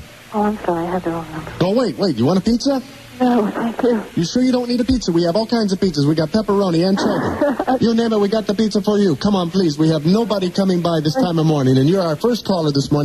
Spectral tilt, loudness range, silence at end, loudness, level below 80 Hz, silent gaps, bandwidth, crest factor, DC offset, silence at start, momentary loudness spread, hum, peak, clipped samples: -6.5 dB/octave; 2 LU; 0 s; -17 LUFS; -44 dBFS; none; 13.5 kHz; 12 dB; 0.1%; 0 s; 5 LU; none; -4 dBFS; under 0.1%